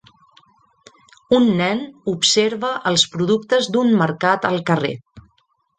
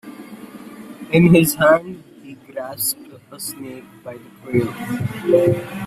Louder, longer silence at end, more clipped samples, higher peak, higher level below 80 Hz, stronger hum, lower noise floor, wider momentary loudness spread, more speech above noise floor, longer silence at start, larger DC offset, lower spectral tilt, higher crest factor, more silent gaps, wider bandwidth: about the same, -18 LUFS vs -17 LUFS; first, 0.6 s vs 0 s; neither; about the same, -2 dBFS vs -2 dBFS; second, -58 dBFS vs -52 dBFS; neither; first, -64 dBFS vs -37 dBFS; second, 7 LU vs 24 LU; first, 46 dB vs 19 dB; first, 1.3 s vs 0.05 s; neither; second, -4 dB/octave vs -5.5 dB/octave; about the same, 18 dB vs 18 dB; neither; second, 9.4 kHz vs 16 kHz